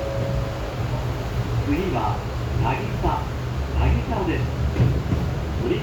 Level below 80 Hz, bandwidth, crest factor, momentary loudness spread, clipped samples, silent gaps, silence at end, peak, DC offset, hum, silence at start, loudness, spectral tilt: -30 dBFS; 19.5 kHz; 14 dB; 5 LU; under 0.1%; none; 0 s; -8 dBFS; under 0.1%; none; 0 s; -24 LUFS; -7.5 dB/octave